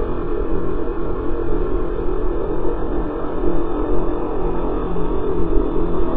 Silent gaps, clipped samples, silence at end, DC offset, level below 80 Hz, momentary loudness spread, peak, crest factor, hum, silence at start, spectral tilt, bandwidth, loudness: none; under 0.1%; 0 s; under 0.1%; -24 dBFS; 3 LU; -2 dBFS; 14 dB; none; 0 s; -12 dB/octave; 3.8 kHz; -23 LUFS